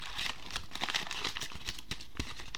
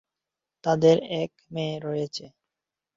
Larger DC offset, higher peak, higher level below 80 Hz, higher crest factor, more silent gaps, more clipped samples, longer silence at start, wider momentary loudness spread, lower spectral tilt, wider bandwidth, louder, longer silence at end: first, 0.8% vs under 0.1%; second, -14 dBFS vs -6 dBFS; first, -52 dBFS vs -66 dBFS; about the same, 26 dB vs 22 dB; neither; neither; second, 0 s vs 0.65 s; second, 8 LU vs 13 LU; second, -1.5 dB/octave vs -6.5 dB/octave; first, 19 kHz vs 7.6 kHz; second, -38 LUFS vs -26 LUFS; second, 0 s vs 0.7 s